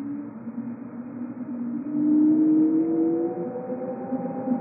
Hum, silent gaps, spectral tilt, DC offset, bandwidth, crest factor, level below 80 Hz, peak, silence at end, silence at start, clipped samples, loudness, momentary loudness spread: none; none; -7.5 dB/octave; under 0.1%; 2.6 kHz; 12 dB; -74 dBFS; -12 dBFS; 0 s; 0 s; under 0.1%; -25 LUFS; 16 LU